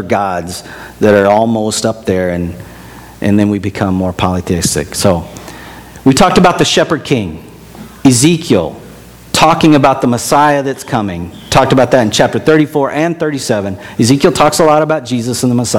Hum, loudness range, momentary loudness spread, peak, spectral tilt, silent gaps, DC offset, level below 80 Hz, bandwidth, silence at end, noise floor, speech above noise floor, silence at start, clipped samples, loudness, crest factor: none; 4 LU; 15 LU; 0 dBFS; -5 dB/octave; none; under 0.1%; -38 dBFS; 19 kHz; 0 s; -34 dBFS; 23 dB; 0 s; 0.6%; -11 LUFS; 12 dB